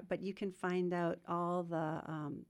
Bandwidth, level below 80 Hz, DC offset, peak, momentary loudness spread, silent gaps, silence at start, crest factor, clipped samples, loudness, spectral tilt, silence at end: 11.5 kHz; -76 dBFS; under 0.1%; -24 dBFS; 6 LU; none; 0 s; 14 dB; under 0.1%; -39 LUFS; -7.5 dB/octave; 0.05 s